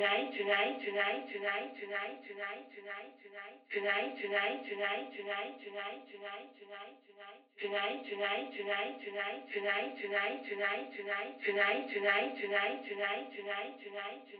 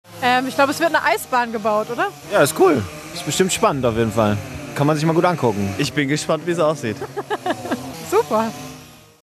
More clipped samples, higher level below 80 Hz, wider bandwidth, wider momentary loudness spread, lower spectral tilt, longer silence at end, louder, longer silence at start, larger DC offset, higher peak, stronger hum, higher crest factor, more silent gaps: neither; second, under -90 dBFS vs -50 dBFS; second, 5.2 kHz vs 14.5 kHz; first, 16 LU vs 10 LU; second, 1 dB/octave vs -4.5 dB/octave; second, 0 s vs 0.25 s; second, -36 LUFS vs -19 LUFS; about the same, 0 s vs 0.1 s; neither; second, -16 dBFS vs -2 dBFS; neither; about the same, 22 dB vs 18 dB; neither